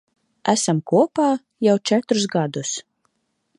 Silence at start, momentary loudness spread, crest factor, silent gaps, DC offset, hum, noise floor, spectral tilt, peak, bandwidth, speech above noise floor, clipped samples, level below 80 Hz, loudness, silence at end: 0.45 s; 9 LU; 20 dB; none; under 0.1%; none; -70 dBFS; -4.5 dB/octave; -2 dBFS; 11 kHz; 50 dB; under 0.1%; -72 dBFS; -20 LUFS; 0.75 s